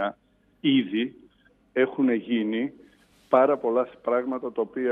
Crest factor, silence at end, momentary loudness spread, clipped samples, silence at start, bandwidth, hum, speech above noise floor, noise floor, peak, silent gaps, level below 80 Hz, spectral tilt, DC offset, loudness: 20 dB; 0 s; 9 LU; under 0.1%; 0 s; 3.9 kHz; none; 39 dB; -63 dBFS; -6 dBFS; none; -70 dBFS; -8 dB/octave; under 0.1%; -25 LUFS